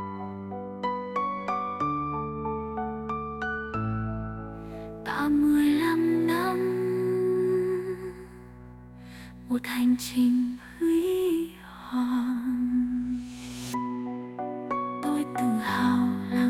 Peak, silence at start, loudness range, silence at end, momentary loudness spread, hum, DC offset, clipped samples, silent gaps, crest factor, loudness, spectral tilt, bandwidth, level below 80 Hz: -12 dBFS; 0 s; 6 LU; 0 s; 15 LU; none; under 0.1%; under 0.1%; none; 14 dB; -28 LUFS; -6 dB/octave; 16 kHz; -52 dBFS